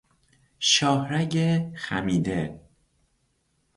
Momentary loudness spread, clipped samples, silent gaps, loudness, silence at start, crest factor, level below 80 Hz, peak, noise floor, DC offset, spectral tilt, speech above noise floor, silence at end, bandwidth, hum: 10 LU; under 0.1%; none; -24 LUFS; 0.6 s; 20 dB; -54 dBFS; -8 dBFS; -71 dBFS; under 0.1%; -4 dB/octave; 46 dB; 1.15 s; 11.5 kHz; none